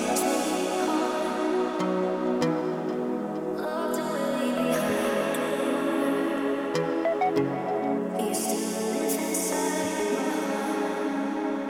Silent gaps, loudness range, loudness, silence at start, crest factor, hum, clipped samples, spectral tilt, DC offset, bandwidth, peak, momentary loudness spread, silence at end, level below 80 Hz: none; 1 LU; -27 LUFS; 0 s; 14 dB; none; under 0.1%; -4 dB/octave; under 0.1%; 17.5 kHz; -12 dBFS; 3 LU; 0 s; -66 dBFS